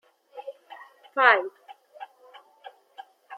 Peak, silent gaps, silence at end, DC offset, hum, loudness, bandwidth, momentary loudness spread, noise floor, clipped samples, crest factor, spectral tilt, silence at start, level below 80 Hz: -2 dBFS; none; 0 s; under 0.1%; none; -21 LUFS; 15 kHz; 28 LU; -53 dBFS; under 0.1%; 26 dB; -2 dB/octave; 0.35 s; under -90 dBFS